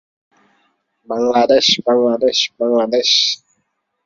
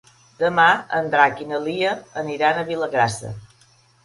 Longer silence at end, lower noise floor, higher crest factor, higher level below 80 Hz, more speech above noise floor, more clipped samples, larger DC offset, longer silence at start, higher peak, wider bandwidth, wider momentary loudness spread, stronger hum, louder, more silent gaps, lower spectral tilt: about the same, 0.7 s vs 0.6 s; first, -69 dBFS vs -56 dBFS; about the same, 16 dB vs 20 dB; about the same, -60 dBFS vs -58 dBFS; first, 55 dB vs 36 dB; neither; neither; first, 1.1 s vs 0.4 s; about the same, -2 dBFS vs 0 dBFS; second, 7.6 kHz vs 11.5 kHz; second, 7 LU vs 12 LU; neither; first, -14 LUFS vs -20 LUFS; neither; second, -2.5 dB/octave vs -4.5 dB/octave